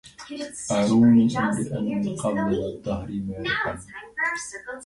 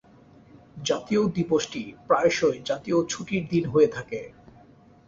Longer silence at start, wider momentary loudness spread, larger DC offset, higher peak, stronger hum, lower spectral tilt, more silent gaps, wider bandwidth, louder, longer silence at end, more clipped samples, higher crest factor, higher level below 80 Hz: second, 0.05 s vs 0.75 s; first, 17 LU vs 13 LU; neither; about the same, -8 dBFS vs -8 dBFS; neither; about the same, -5.5 dB/octave vs -5 dB/octave; neither; first, 11.5 kHz vs 8 kHz; about the same, -24 LUFS vs -25 LUFS; second, 0 s vs 0.8 s; neither; about the same, 16 dB vs 18 dB; first, -50 dBFS vs -58 dBFS